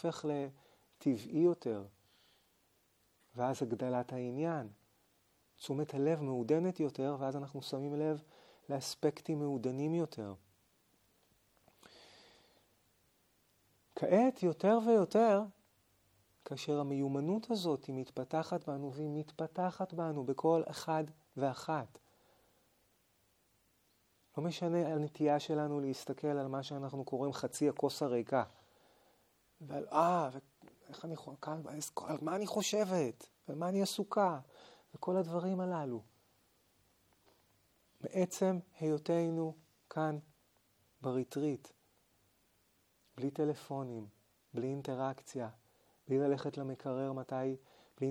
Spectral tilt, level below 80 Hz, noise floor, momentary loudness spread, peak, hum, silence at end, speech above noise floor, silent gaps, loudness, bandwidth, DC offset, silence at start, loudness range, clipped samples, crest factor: -6 dB/octave; -84 dBFS; -74 dBFS; 13 LU; -16 dBFS; none; 0 s; 39 dB; none; -37 LUFS; 17.5 kHz; under 0.1%; 0.05 s; 8 LU; under 0.1%; 22 dB